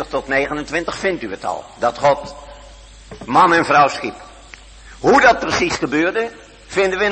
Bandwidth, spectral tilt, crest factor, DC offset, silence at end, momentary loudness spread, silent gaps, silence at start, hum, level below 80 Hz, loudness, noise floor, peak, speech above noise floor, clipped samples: 8.8 kHz; -4 dB/octave; 18 dB; under 0.1%; 0 s; 14 LU; none; 0 s; none; -44 dBFS; -17 LUFS; -40 dBFS; 0 dBFS; 24 dB; under 0.1%